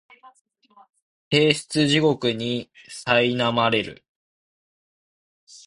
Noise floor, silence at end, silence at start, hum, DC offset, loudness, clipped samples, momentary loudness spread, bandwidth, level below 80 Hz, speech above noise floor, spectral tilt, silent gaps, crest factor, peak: under -90 dBFS; 0.1 s; 0.25 s; none; under 0.1%; -21 LUFS; under 0.1%; 12 LU; 11.5 kHz; -60 dBFS; over 67 dB; -4.5 dB/octave; 0.41-0.45 s, 1.02-1.31 s, 4.09-5.47 s; 22 dB; -4 dBFS